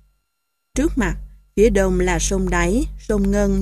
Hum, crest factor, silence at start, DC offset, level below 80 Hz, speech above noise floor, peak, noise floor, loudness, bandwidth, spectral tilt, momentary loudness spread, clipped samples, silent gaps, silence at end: none; 16 dB; 0.75 s; under 0.1%; -26 dBFS; 58 dB; -2 dBFS; -75 dBFS; -20 LUFS; 14 kHz; -5.5 dB/octave; 9 LU; under 0.1%; none; 0 s